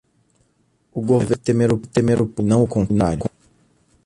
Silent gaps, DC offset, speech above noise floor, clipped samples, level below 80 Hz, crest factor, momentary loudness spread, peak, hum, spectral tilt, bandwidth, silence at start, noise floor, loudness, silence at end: none; under 0.1%; 46 dB; under 0.1%; -42 dBFS; 16 dB; 9 LU; -4 dBFS; none; -7.5 dB/octave; 11.5 kHz; 0.95 s; -63 dBFS; -19 LUFS; 0.8 s